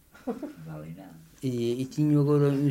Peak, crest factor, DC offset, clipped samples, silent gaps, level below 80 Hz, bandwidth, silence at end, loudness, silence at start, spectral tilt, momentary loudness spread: -12 dBFS; 14 dB; under 0.1%; under 0.1%; none; -64 dBFS; 15.5 kHz; 0 s; -27 LUFS; 0.25 s; -8.5 dB/octave; 19 LU